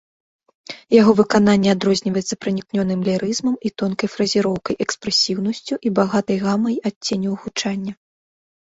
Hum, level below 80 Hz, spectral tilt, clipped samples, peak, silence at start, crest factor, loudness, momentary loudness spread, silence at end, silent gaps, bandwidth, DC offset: none; -56 dBFS; -5 dB/octave; under 0.1%; -2 dBFS; 0.7 s; 18 dB; -19 LUFS; 9 LU; 0.75 s; 6.96-7.01 s; 8 kHz; under 0.1%